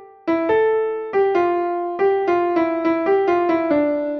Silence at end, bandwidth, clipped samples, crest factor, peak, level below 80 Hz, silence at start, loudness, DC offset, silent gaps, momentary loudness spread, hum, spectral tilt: 0 s; 6.2 kHz; under 0.1%; 12 dB; -8 dBFS; -58 dBFS; 0 s; -19 LUFS; under 0.1%; none; 4 LU; none; -7 dB/octave